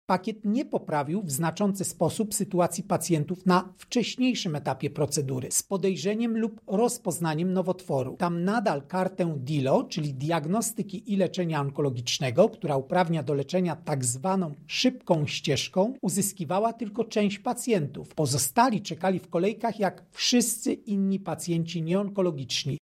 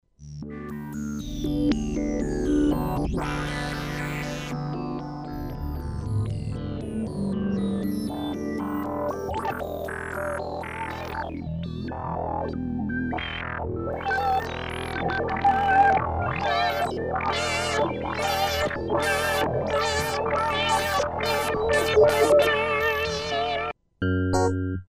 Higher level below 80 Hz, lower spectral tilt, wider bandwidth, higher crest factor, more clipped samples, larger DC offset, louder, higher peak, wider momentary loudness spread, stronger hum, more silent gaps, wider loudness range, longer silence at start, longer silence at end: second, -66 dBFS vs -40 dBFS; about the same, -5 dB/octave vs -5 dB/octave; about the same, 16 kHz vs 15.5 kHz; about the same, 18 dB vs 20 dB; neither; neither; about the same, -27 LUFS vs -26 LUFS; about the same, -8 dBFS vs -6 dBFS; second, 5 LU vs 11 LU; neither; neither; second, 1 LU vs 9 LU; about the same, 0.1 s vs 0.2 s; about the same, 0.05 s vs 0.05 s